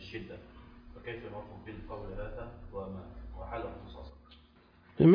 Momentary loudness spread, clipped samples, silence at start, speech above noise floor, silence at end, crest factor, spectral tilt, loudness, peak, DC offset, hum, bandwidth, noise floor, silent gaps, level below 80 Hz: 14 LU; under 0.1%; 0 s; 18 dB; 0 s; 22 dB; -8 dB/octave; -40 LUFS; -12 dBFS; under 0.1%; none; 5.2 kHz; -61 dBFS; none; -50 dBFS